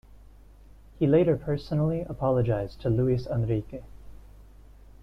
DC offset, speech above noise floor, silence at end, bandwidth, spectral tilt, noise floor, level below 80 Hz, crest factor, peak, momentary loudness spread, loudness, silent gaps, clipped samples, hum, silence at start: under 0.1%; 25 dB; 0.2 s; 6 kHz; -10 dB/octave; -51 dBFS; -46 dBFS; 18 dB; -10 dBFS; 7 LU; -26 LUFS; none; under 0.1%; none; 0.1 s